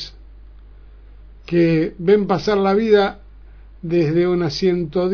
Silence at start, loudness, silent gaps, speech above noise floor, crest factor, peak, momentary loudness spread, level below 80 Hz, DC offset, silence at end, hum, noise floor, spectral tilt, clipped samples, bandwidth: 0 s; -18 LUFS; none; 25 dB; 16 dB; -2 dBFS; 7 LU; -42 dBFS; under 0.1%; 0 s; none; -41 dBFS; -7.5 dB/octave; under 0.1%; 5.4 kHz